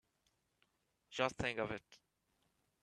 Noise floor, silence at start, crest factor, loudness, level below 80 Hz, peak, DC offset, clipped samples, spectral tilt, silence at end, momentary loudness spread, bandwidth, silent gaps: -82 dBFS; 1.1 s; 28 dB; -41 LUFS; -68 dBFS; -18 dBFS; under 0.1%; under 0.1%; -4.5 dB/octave; 0.85 s; 12 LU; 12.5 kHz; none